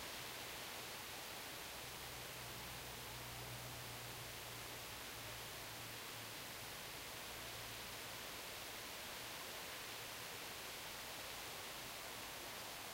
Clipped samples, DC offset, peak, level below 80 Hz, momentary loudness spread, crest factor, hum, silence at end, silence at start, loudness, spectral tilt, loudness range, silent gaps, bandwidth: under 0.1%; under 0.1%; -38 dBFS; -68 dBFS; 1 LU; 14 dB; none; 0 s; 0 s; -48 LUFS; -1.5 dB/octave; 1 LU; none; 16 kHz